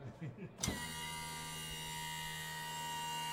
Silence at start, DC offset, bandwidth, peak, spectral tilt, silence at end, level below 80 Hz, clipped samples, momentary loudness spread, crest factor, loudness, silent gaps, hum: 0 s; under 0.1%; 16 kHz; -20 dBFS; -2.5 dB/octave; 0 s; -62 dBFS; under 0.1%; 4 LU; 24 dB; -42 LUFS; none; none